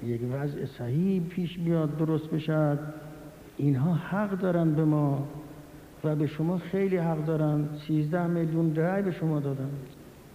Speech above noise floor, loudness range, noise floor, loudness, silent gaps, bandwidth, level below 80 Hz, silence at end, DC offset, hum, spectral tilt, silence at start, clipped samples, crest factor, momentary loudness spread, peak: 20 dB; 1 LU; -47 dBFS; -28 LUFS; none; 15.5 kHz; -58 dBFS; 0 s; under 0.1%; none; -9 dB/octave; 0 s; under 0.1%; 14 dB; 15 LU; -14 dBFS